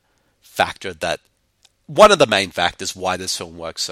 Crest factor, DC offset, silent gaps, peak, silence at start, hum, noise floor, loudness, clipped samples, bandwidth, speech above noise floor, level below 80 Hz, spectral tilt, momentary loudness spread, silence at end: 20 dB; under 0.1%; none; 0 dBFS; 0.55 s; none; -60 dBFS; -18 LUFS; under 0.1%; 16 kHz; 42 dB; -50 dBFS; -2.5 dB/octave; 15 LU; 0 s